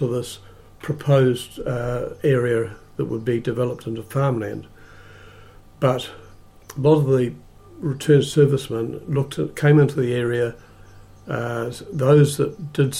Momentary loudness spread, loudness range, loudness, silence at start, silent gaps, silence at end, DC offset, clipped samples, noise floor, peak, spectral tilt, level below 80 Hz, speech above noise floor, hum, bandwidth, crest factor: 14 LU; 6 LU; -21 LUFS; 0 s; none; 0 s; under 0.1%; under 0.1%; -45 dBFS; -4 dBFS; -7 dB/octave; -48 dBFS; 25 dB; none; 14.5 kHz; 16 dB